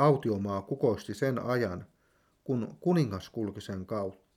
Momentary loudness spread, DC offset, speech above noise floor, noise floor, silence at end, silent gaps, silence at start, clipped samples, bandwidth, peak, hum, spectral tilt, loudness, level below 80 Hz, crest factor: 9 LU; under 0.1%; 40 dB; -70 dBFS; 0.2 s; none; 0 s; under 0.1%; 15.5 kHz; -12 dBFS; none; -7.5 dB/octave; -32 LUFS; -66 dBFS; 18 dB